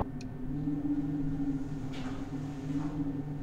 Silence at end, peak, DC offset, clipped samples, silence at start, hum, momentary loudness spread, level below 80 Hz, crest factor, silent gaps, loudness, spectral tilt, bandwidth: 0 s; -18 dBFS; under 0.1%; under 0.1%; 0 s; none; 6 LU; -46 dBFS; 16 dB; none; -36 LUFS; -8 dB/octave; 8.8 kHz